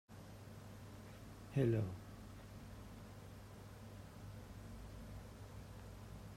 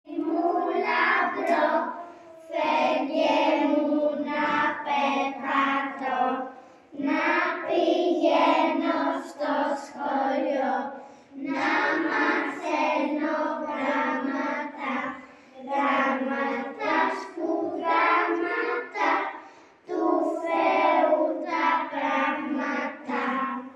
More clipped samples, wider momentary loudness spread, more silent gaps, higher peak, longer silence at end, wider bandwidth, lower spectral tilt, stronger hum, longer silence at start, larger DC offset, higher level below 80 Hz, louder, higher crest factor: neither; first, 17 LU vs 9 LU; neither; second, -24 dBFS vs -8 dBFS; about the same, 0 s vs 0 s; first, 16 kHz vs 11 kHz; first, -7.5 dB/octave vs -4 dB/octave; neither; about the same, 0.1 s vs 0.05 s; neither; first, -60 dBFS vs -82 dBFS; second, -48 LUFS vs -25 LUFS; first, 24 dB vs 18 dB